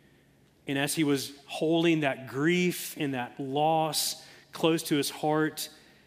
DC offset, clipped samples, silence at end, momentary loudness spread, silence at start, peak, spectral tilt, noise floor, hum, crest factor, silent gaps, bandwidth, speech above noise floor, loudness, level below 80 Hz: under 0.1%; under 0.1%; 0.3 s; 10 LU; 0.65 s; -10 dBFS; -4.5 dB/octave; -62 dBFS; none; 20 dB; none; 16 kHz; 34 dB; -28 LUFS; -74 dBFS